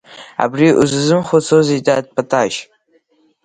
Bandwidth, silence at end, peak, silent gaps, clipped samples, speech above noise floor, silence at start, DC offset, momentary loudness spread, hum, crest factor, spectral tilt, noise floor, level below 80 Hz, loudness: 9.6 kHz; 0.8 s; 0 dBFS; none; under 0.1%; 43 dB; 0.1 s; under 0.1%; 8 LU; none; 16 dB; -5.5 dB/octave; -57 dBFS; -56 dBFS; -14 LUFS